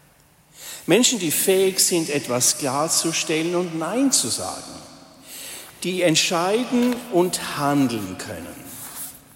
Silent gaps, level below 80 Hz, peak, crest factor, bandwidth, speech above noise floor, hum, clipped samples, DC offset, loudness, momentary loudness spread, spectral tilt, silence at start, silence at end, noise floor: none; -62 dBFS; -4 dBFS; 18 dB; 16.5 kHz; 34 dB; none; under 0.1%; under 0.1%; -20 LUFS; 18 LU; -3 dB/octave; 0.55 s; 0.2 s; -55 dBFS